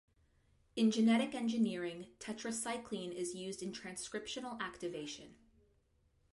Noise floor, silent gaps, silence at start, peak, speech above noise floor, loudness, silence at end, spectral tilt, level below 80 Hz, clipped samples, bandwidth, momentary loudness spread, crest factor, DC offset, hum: -74 dBFS; none; 0.75 s; -22 dBFS; 37 dB; -38 LUFS; 1 s; -4 dB/octave; -74 dBFS; under 0.1%; 11.5 kHz; 14 LU; 18 dB; under 0.1%; none